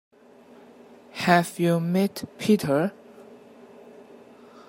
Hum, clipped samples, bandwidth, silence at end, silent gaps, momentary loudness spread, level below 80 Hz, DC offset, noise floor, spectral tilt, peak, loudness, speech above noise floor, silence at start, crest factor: none; under 0.1%; 16.5 kHz; 1.35 s; none; 9 LU; -68 dBFS; under 0.1%; -52 dBFS; -6 dB/octave; -2 dBFS; -24 LUFS; 29 dB; 1.15 s; 24 dB